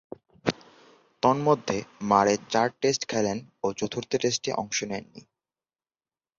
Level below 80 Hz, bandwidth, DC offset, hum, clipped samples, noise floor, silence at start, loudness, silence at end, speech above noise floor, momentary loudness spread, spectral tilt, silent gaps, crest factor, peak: -62 dBFS; 7.8 kHz; under 0.1%; none; under 0.1%; under -90 dBFS; 0.45 s; -27 LUFS; 1.2 s; over 64 dB; 10 LU; -4 dB/octave; none; 24 dB; -4 dBFS